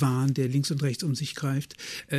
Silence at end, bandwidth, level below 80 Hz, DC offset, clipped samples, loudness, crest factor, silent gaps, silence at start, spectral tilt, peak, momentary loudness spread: 0 s; 14 kHz; -66 dBFS; under 0.1%; under 0.1%; -28 LUFS; 16 dB; none; 0 s; -5.5 dB/octave; -12 dBFS; 8 LU